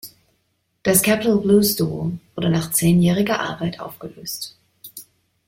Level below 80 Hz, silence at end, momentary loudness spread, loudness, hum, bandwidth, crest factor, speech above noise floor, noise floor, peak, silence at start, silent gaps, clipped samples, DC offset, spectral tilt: -52 dBFS; 0.45 s; 21 LU; -19 LUFS; none; 16.5 kHz; 18 dB; 50 dB; -69 dBFS; -2 dBFS; 0.05 s; none; under 0.1%; under 0.1%; -5 dB/octave